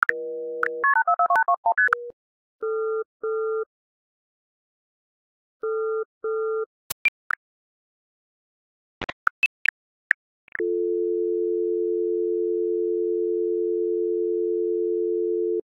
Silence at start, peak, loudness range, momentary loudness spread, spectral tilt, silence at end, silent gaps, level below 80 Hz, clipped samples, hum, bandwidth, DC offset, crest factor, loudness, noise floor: 0 s; -2 dBFS; 9 LU; 11 LU; -4 dB/octave; 0.05 s; 1.57-1.63 s, 2.13-2.59 s, 3.05-3.20 s, 3.66-5.60 s, 6.05-6.21 s, 6.66-7.30 s, 7.36-9.01 s, 9.13-10.52 s; -68 dBFS; under 0.1%; none; 15.5 kHz; under 0.1%; 24 dB; -25 LUFS; under -90 dBFS